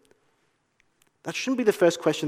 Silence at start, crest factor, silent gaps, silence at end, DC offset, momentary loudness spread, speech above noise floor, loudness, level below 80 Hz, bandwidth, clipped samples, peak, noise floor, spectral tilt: 1.25 s; 20 dB; none; 0 s; under 0.1%; 13 LU; 47 dB; -24 LUFS; -78 dBFS; 16 kHz; under 0.1%; -8 dBFS; -70 dBFS; -4.5 dB/octave